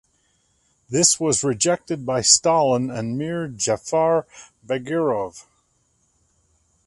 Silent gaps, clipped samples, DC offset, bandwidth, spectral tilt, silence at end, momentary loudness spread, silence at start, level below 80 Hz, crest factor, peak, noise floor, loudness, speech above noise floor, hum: none; under 0.1%; under 0.1%; 11.5 kHz; -3 dB/octave; 1.45 s; 12 LU; 0.9 s; -58 dBFS; 22 dB; 0 dBFS; -66 dBFS; -20 LUFS; 45 dB; none